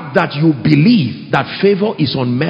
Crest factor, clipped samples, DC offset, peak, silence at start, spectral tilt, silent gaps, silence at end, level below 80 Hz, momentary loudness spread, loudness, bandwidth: 14 dB; under 0.1%; under 0.1%; 0 dBFS; 0 s; -8.5 dB/octave; none; 0 s; -50 dBFS; 6 LU; -13 LUFS; 8 kHz